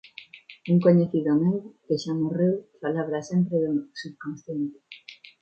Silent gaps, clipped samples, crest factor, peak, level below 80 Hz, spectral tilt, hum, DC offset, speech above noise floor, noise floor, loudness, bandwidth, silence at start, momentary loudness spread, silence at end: none; under 0.1%; 18 dB; -6 dBFS; -70 dBFS; -8 dB/octave; none; under 0.1%; 23 dB; -47 dBFS; -25 LUFS; 7.2 kHz; 0.2 s; 23 LU; 0.25 s